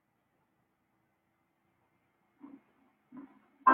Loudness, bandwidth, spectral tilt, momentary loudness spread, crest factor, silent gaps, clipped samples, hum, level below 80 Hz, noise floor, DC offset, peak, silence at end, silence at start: -30 LUFS; 3.4 kHz; -2.5 dB/octave; 17 LU; 26 dB; none; under 0.1%; none; -90 dBFS; -77 dBFS; under 0.1%; -12 dBFS; 0 s; 3.65 s